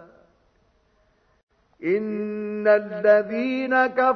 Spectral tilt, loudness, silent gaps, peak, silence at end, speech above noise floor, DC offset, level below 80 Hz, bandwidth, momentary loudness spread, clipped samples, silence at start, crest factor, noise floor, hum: -7.5 dB/octave; -22 LUFS; 1.43-1.47 s; -6 dBFS; 0 s; 43 dB; under 0.1%; -68 dBFS; 6 kHz; 10 LU; under 0.1%; 0 s; 18 dB; -64 dBFS; none